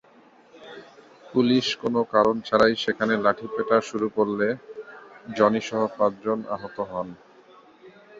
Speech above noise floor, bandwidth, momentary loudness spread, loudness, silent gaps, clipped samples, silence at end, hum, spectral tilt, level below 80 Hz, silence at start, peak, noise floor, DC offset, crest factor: 31 dB; 7.8 kHz; 20 LU; -24 LUFS; none; under 0.1%; 0 s; none; -5.5 dB/octave; -62 dBFS; 0.55 s; -4 dBFS; -54 dBFS; under 0.1%; 20 dB